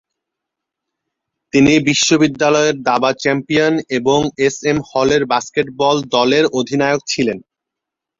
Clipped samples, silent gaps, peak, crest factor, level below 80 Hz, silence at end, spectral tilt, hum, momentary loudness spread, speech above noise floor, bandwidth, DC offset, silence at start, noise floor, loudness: under 0.1%; none; 0 dBFS; 16 dB; -50 dBFS; 0.8 s; -4 dB/octave; none; 6 LU; 68 dB; 7.8 kHz; under 0.1%; 1.55 s; -83 dBFS; -15 LUFS